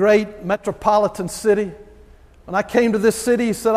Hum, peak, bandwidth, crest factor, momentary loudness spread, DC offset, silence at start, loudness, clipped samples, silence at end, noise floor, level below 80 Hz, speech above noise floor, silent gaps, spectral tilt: none; -2 dBFS; 15.5 kHz; 16 dB; 7 LU; under 0.1%; 0 s; -19 LUFS; under 0.1%; 0 s; -46 dBFS; -48 dBFS; 28 dB; none; -5 dB/octave